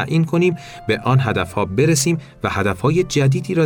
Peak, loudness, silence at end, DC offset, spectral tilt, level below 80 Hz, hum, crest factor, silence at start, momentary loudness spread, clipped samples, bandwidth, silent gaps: -6 dBFS; -18 LUFS; 0 s; under 0.1%; -5.5 dB/octave; -46 dBFS; none; 12 dB; 0 s; 6 LU; under 0.1%; 17.5 kHz; none